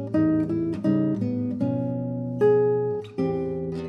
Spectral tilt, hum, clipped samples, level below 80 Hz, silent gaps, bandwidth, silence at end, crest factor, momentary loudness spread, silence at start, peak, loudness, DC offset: -10 dB/octave; none; under 0.1%; -56 dBFS; none; 6.2 kHz; 0 s; 14 dB; 8 LU; 0 s; -10 dBFS; -25 LUFS; under 0.1%